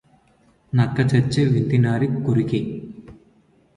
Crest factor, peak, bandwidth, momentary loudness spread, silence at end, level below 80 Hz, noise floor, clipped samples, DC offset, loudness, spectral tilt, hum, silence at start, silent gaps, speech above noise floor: 16 dB; -6 dBFS; 11 kHz; 10 LU; 0.65 s; -50 dBFS; -58 dBFS; under 0.1%; under 0.1%; -20 LUFS; -8 dB/octave; none; 0.75 s; none; 39 dB